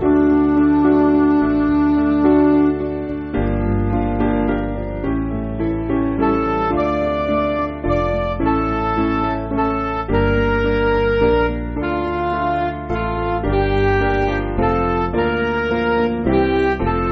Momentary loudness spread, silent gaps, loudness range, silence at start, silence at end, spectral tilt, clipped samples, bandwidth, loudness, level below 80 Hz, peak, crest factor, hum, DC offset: 8 LU; none; 4 LU; 0 s; 0 s; -6.5 dB/octave; under 0.1%; 6 kHz; -18 LUFS; -28 dBFS; -4 dBFS; 14 dB; none; under 0.1%